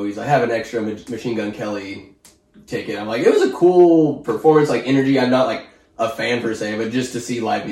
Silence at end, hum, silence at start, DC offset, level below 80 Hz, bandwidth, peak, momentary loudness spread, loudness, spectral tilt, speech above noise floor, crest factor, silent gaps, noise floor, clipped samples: 0 s; none; 0 s; under 0.1%; -58 dBFS; 13 kHz; 0 dBFS; 13 LU; -18 LUFS; -6 dB/octave; 32 dB; 18 dB; none; -49 dBFS; under 0.1%